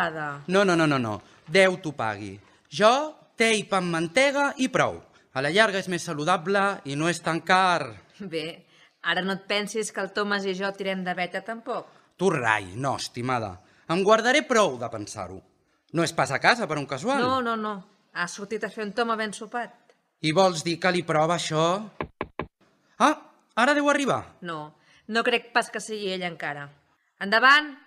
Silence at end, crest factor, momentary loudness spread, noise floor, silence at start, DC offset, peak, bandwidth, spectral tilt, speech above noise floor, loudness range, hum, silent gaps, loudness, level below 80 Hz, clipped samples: 0.1 s; 22 dB; 15 LU; -64 dBFS; 0 s; under 0.1%; -4 dBFS; 15 kHz; -4 dB/octave; 39 dB; 4 LU; none; none; -25 LUFS; -64 dBFS; under 0.1%